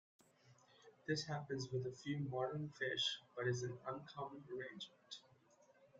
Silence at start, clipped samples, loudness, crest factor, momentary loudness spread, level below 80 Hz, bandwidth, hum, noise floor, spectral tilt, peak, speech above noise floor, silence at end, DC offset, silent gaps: 0.45 s; under 0.1%; -44 LUFS; 18 dB; 13 LU; -82 dBFS; 9.2 kHz; none; -71 dBFS; -4.5 dB/octave; -28 dBFS; 27 dB; 0 s; under 0.1%; none